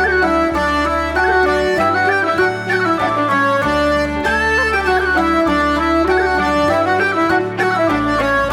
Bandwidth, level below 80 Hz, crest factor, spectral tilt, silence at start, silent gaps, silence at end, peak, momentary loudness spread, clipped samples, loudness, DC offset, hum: 15.5 kHz; -34 dBFS; 12 dB; -5.5 dB/octave; 0 s; none; 0 s; -4 dBFS; 2 LU; under 0.1%; -15 LUFS; under 0.1%; none